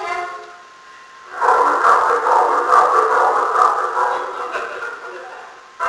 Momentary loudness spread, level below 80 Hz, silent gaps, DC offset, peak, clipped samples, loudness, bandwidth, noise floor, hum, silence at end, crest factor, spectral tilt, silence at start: 19 LU; -62 dBFS; none; under 0.1%; 0 dBFS; under 0.1%; -15 LUFS; 11 kHz; -41 dBFS; none; 0 s; 18 dB; -2 dB/octave; 0 s